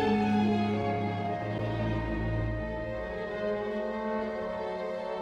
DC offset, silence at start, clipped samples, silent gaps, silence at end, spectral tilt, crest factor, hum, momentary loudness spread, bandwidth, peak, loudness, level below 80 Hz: under 0.1%; 0 s; under 0.1%; none; 0 s; -8 dB/octave; 14 dB; none; 8 LU; 7.8 kHz; -16 dBFS; -32 LUFS; -44 dBFS